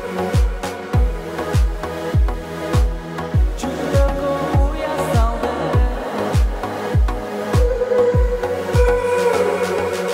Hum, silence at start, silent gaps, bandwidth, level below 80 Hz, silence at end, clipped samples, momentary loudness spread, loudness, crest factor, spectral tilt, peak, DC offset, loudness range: none; 0 s; none; 15.5 kHz; -22 dBFS; 0 s; under 0.1%; 6 LU; -19 LUFS; 14 dB; -6.5 dB/octave; -4 dBFS; under 0.1%; 3 LU